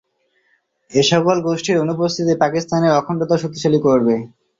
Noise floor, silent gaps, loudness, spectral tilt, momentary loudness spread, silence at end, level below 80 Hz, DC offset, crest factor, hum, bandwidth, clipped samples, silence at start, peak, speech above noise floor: -64 dBFS; none; -17 LUFS; -5.5 dB/octave; 5 LU; 0.35 s; -56 dBFS; under 0.1%; 16 dB; none; 7.8 kHz; under 0.1%; 0.9 s; -2 dBFS; 47 dB